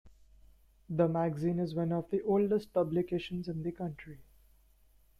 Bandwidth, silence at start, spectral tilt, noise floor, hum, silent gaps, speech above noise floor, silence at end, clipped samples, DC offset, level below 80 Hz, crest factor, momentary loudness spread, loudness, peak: 13 kHz; 0.05 s; -9 dB/octave; -64 dBFS; none; none; 32 dB; 0.95 s; under 0.1%; under 0.1%; -62 dBFS; 18 dB; 11 LU; -33 LUFS; -16 dBFS